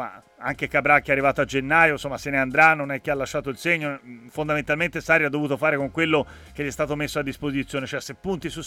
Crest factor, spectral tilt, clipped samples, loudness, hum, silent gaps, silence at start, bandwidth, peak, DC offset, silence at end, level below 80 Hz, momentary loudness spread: 20 dB; -5 dB/octave; under 0.1%; -22 LUFS; none; none; 0 s; 16.5 kHz; -4 dBFS; under 0.1%; 0 s; -50 dBFS; 13 LU